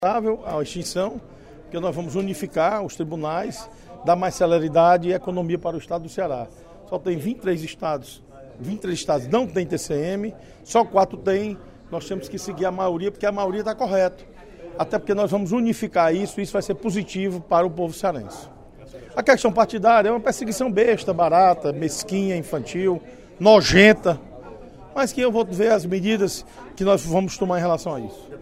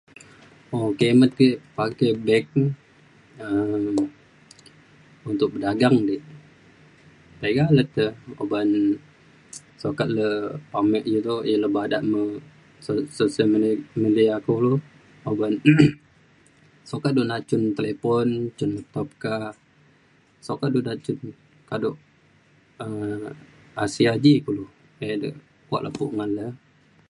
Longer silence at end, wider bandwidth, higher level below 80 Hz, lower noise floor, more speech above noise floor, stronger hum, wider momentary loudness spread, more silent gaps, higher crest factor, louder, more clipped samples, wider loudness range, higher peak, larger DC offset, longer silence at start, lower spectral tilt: second, 0 s vs 0.55 s; first, 16 kHz vs 11 kHz; first, -48 dBFS vs -60 dBFS; second, -41 dBFS vs -58 dBFS; second, 19 dB vs 37 dB; neither; about the same, 15 LU vs 15 LU; neither; about the same, 22 dB vs 22 dB; about the same, -22 LUFS vs -23 LUFS; neither; about the same, 8 LU vs 8 LU; about the same, 0 dBFS vs -2 dBFS; neither; second, 0 s vs 0.7 s; second, -5 dB/octave vs -7 dB/octave